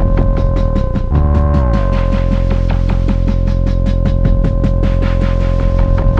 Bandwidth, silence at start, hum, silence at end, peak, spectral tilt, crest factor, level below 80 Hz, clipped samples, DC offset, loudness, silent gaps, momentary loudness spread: 5.8 kHz; 0 s; none; 0 s; 0 dBFS; -9 dB/octave; 12 dB; -14 dBFS; under 0.1%; under 0.1%; -15 LUFS; none; 3 LU